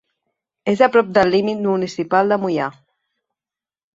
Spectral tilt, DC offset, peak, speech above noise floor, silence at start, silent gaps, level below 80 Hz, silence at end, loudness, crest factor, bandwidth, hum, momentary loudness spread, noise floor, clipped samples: -6.5 dB/octave; under 0.1%; 0 dBFS; over 73 dB; 0.65 s; none; -60 dBFS; 1.25 s; -18 LUFS; 18 dB; 7.8 kHz; none; 9 LU; under -90 dBFS; under 0.1%